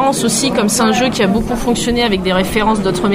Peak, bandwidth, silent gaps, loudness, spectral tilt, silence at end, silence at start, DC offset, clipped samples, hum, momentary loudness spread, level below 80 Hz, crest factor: 0 dBFS; 16 kHz; none; -14 LUFS; -4 dB/octave; 0 s; 0 s; under 0.1%; under 0.1%; none; 3 LU; -32 dBFS; 14 dB